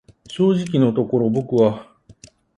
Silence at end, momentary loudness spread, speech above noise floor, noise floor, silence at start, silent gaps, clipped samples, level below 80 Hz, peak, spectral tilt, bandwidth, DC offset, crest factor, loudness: 0.45 s; 7 LU; 31 dB; -48 dBFS; 0.3 s; none; under 0.1%; -58 dBFS; -4 dBFS; -8 dB/octave; 11 kHz; under 0.1%; 16 dB; -19 LUFS